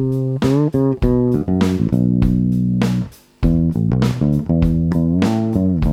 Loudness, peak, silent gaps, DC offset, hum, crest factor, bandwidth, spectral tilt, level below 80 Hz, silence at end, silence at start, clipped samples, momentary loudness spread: -17 LUFS; -2 dBFS; none; under 0.1%; none; 14 dB; 15 kHz; -8.5 dB/octave; -28 dBFS; 0 s; 0 s; under 0.1%; 3 LU